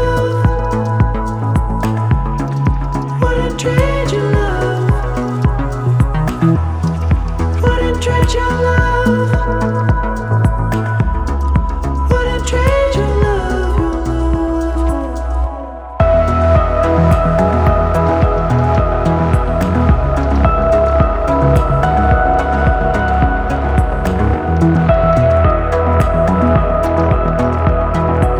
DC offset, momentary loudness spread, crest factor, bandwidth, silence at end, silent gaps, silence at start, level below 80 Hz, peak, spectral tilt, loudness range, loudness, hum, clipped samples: under 0.1%; 5 LU; 12 dB; 12 kHz; 0 s; none; 0 s; -18 dBFS; 0 dBFS; -7.5 dB/octave; 3 LU; -14 LUFS; none; under 0.1%